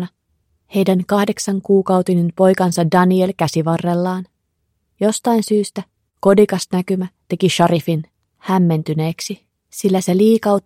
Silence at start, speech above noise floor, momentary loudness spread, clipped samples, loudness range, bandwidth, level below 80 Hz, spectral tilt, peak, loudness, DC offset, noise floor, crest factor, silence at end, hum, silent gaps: 0 s; 54 dB; 11 LU; under 0.1%; 3 LU; 16 kHz; -58 dBFS; -6 dB/octave; 0 dBFS; -17 LUFS; under 0.1%; -69 dBFS; 16 dB; 0.05 s; none; none